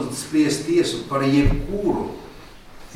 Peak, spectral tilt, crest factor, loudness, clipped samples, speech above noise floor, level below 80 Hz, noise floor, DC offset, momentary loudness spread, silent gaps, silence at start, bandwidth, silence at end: -6 dBFS; -5.5 dB/octave; 16 dB; -21 LUFS; under 0.1%; 21 dB; -32 dBFS; -41 dBFS; under 0.1%; 13 LU; none; 0 s; 15 kHz; 0 s